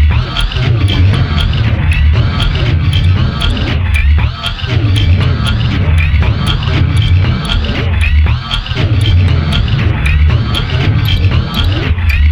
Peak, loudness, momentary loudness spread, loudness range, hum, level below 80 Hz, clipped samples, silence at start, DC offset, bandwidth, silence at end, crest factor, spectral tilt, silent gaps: 0 dBFS; -12 LUFS; 3 LU; 1 LU; none; -14 dBFS; under 0.1%; 0 s; under 0.1%; 12.5 kHz; 0 s; 10 dB; -6.5 dB/octave; none